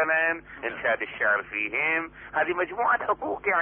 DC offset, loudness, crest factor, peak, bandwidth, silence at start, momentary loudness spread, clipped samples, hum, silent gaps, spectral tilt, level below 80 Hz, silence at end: under 0.1%; -26 LUFS; 14 dB; -12 dBFS; 3.7 kHz; 0 s; 5 LU; under 0.1%; none; none; -7.5 dB/octave; -60 dBFS; 0 s